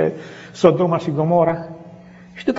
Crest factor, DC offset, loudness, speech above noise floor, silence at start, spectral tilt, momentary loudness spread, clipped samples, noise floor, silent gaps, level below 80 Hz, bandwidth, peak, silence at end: 20 dB; under 0.1%; -18 LUFS; 24 dB; 0 s; -7 dB/octave; 20 LU; under 0.1%; -41 dBFS; none; -56 dBFS; 8 kHz; 0 dBFS; 0 s